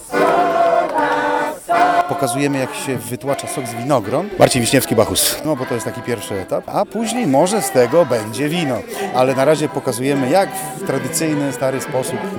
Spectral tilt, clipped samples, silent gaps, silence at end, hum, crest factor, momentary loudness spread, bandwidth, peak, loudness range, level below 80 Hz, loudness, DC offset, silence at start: -4.5 dB/octave; under 0.1%; none; 0 s; none; 18 dB; 9 LU; over 20 kHz; 0 dBFS; 1 LU; -52 dBFS; -17 LUFS; under 0.1%; 0 s